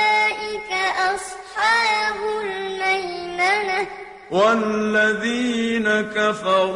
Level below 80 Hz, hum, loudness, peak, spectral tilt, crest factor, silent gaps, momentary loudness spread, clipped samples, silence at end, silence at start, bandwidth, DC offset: -56 dBFS; none; -20 LUFS; -6 dBFS; -3.5 dB/octave; 16 dB; none; 9 LU; under 0.1%; 0 s; 0 s; 13.5 kHz; under 0.1%